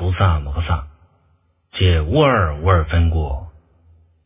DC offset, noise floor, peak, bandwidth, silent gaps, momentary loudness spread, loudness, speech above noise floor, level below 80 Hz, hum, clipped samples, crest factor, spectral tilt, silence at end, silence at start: under 0.1%; -60 dBFS; 0 dBFS; 3.8 kHz; none; 10 LU; -18 LUFS; 44 dB; -24 dBFS; none; under 0.1%; 18 dB; -10.5 dB/octave; 0.75 s; 0 s